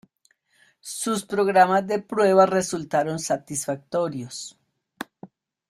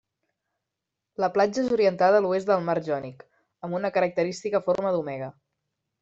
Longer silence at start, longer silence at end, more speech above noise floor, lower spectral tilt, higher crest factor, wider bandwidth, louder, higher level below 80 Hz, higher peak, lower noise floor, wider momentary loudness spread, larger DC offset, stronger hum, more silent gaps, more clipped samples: second, 0.85 s vs 1.2 s; second, 0.45 s vs 0.7 s; second, 44 dB vs 61 dB; second, -4.5 dB/octave vs -6 dB/octave; about the same, 20 dB vs 18 dB; first, 15.5 kHz vs 8 kHz; first, -22 LUFS vs -25 LUFS; about the same, -66 dBFS vs -68 dBFS; first, -4 dBFS vs -8 dBFS; second, -66 dBFS vs -85 dBFS; first, 21 LU vs 15 LU; neither; neither; neither; neither